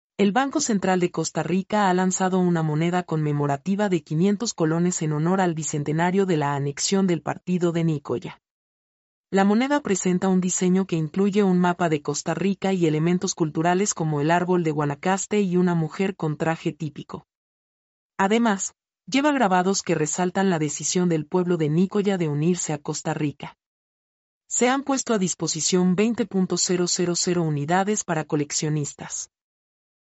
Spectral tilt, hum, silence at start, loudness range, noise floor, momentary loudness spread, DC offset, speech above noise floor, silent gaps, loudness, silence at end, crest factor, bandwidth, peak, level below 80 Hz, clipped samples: -5 dB/octave; none; 0.2 s; 3 LU; under -90 dBFS; 7 LU; under 0.1%; over 68 dB; 8.51-9.24 s, 17.35-18.10 s, 23.66-24.41 s; -23 LUFS; 0.9 s; 16 dB; 8.2 kHz; -8 dBFS; -66 dBFS; under 0.1%